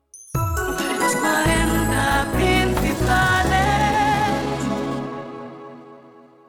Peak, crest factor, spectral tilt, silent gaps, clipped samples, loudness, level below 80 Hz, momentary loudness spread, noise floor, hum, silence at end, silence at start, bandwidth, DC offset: -8 dBFS; 14 dB; -4.5 dB/octave; none; under 0.1%; -20 LUFS; -32 dBFS; 14 LU; -47 dBFS; none; 0.5 s; 0.15 s; 19.5 kHz; under 0.1%